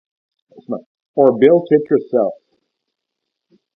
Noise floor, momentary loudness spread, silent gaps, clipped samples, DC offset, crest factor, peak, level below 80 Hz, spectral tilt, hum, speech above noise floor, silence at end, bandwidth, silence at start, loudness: -79 dBFS; 17 LU; 0.86-0.95 s, 1.08-1.14 s; under 0.1%; under 0.1%; 18 dB; 0 dBFS; -66 dBFS; -10 dB/octave; none; 65 dB; 1.45 s; 3.9 kHz; 0.7 s; -15 LUFS